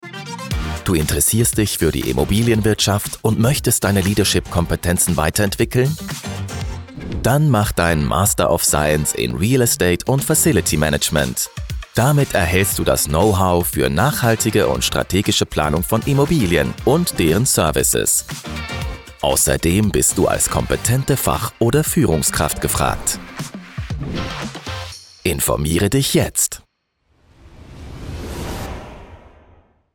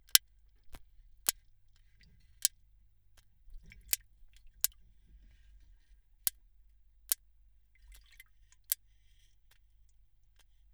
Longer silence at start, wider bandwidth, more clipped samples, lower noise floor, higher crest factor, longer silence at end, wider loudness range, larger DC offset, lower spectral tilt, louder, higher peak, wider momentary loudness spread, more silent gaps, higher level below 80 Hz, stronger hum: about the same, 0.05 s vs 0.15 s; about the same, 19 kHz vs over 20 kHz; neither; about the same, -65 dBFS vs -66 dBFS; second, 14 dB vs 42 dB; second, 0.65 s vs 2 s; about the same, 5 LU vs 3 LU; neither; first, -4 dB/octave vs 2.5 dB/octave; first, -17 LUFS vs -34 LUFS; second, -4 dBFS vs 0 dBFS; first, 13 LU vs 6 LU; neither; first, -32 dBFS vs -62 dBFS; neither